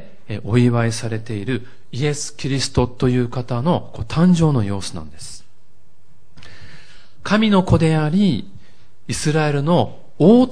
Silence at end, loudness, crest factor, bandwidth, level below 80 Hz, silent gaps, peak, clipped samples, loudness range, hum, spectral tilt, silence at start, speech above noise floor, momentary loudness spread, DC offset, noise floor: 0 s; -18 LUFS; 18 dB; 10.5 kHz; -40 dBFS; none; 0 dBFS; under 0.1%; 4 LU; none; -6.5 dB/octave; 0.3 s; 40 dB; 15 LU; 3%; -58 dBFS